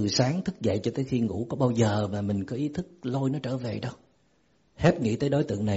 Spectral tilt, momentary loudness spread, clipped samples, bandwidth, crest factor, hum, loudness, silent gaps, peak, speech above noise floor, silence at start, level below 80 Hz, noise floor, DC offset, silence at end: -6.5 dB/octave; 8 LU; under 0.1%; 8 kHz; 18 dB; none; -28 LUFS; none; -8 dBFS; 40 dB; 0 s; -54 dBFS; -67 dBFS; under 0.1%; 0 s